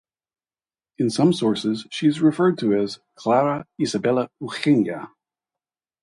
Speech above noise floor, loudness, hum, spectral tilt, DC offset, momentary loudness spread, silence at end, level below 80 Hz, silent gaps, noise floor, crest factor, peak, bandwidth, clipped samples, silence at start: over 69 dB; -22 LUFS; none; -6 dB/octave; under 0.1%; 9 LU; 0.95 s; -64 dBFS; none; under -90 dBFS; 16 dB; -6 dBFS; 11.5 kHz; under 0.1%; 1 s